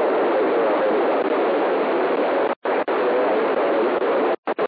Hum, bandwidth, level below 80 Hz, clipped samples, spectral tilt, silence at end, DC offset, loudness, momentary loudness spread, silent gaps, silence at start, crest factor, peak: none; 5.2 kHz; -78 dBFS; under 0.1%; -8 dB/octave; 0 s; under 0.1%; -20 LUFS; 2 LU; 2.56-2.62 s, 4.38-4.43 s; 0 s; 10 dB; -10 dBFS